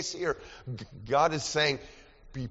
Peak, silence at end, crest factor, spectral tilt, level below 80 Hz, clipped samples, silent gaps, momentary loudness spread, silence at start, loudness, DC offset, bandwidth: -12 dBFS; 0 s; 20 dB; -2.5 dB/octave; -54 dBFS; under 0.1%; none; 15 LU; 0 s; -29 LUFS; under 0.1%; 8 kHz